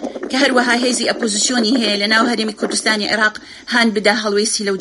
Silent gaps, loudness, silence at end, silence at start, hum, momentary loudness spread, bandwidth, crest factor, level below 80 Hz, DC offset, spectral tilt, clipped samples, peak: none; -15 LUFS; 0 s; 0 s; none; 5 LU; 11.5 kHz; 16 dB; -58 dBFS; under 0.1%; -2 dB/octave; under 0.1%; -2 dBFS